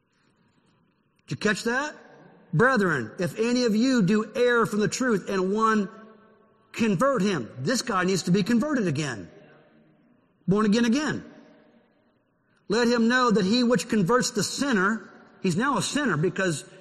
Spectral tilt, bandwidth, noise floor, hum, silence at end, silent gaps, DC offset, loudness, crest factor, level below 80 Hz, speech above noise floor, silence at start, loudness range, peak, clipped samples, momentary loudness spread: -5 dB/octave; 13 kHz; -67 dBFS; none; 0.15 s; none; under 0.1%; -24 LUFS; 16 dB; -60 dBFS; 43 dB; 1.3 s; 4 LU; -8 dBFS; under 0.1%; 9 LU